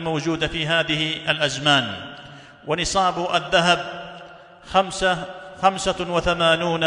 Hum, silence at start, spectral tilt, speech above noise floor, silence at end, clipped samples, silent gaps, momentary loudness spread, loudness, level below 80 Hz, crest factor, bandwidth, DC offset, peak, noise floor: none; 0 s; -3.5 dB/octave; 22 dB; 0 s; under 0.1%; none; 17 LU; -21 LUFS; -46 dBFS; 18 dB; 11 kHz; under 0.1%; -4 dBFS; -43 dBFS